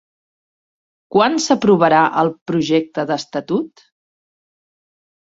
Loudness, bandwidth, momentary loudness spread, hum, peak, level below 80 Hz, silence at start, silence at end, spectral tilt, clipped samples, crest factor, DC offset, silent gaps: -16 LUFS; 8 kHz; 10 LU; none; -2 dBFS; -60 dBFS; 1.1 s; 1.7 s; -5 dB/octave; under 0.1%; 18 dB; under 0.1%; 2.41-2.46 s